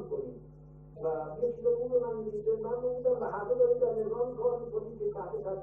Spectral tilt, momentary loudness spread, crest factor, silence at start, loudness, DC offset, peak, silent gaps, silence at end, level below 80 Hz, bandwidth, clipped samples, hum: -11 dB/octave; 10 LU; 16 dB; 0 s; -32 LUFS; under 0.1%; -16 dBFS; none; 0 s; -58 dBFS; 1.8 kHz; under 0.1%; none